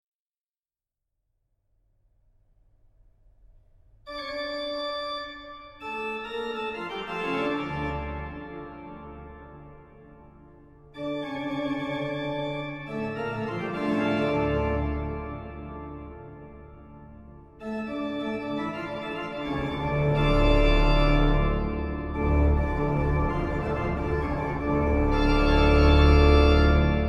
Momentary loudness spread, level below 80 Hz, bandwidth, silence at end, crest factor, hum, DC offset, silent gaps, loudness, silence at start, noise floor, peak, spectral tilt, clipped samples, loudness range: 19 LU; -30 dBFS; 7.4 kHz; 0 s; 20 dB; none; under 0.1%; none; -26 LUFS; 4.05 s; under -90 dBFS; -6 dBFS; -8 dB/octave; under 0.1%; 13 LU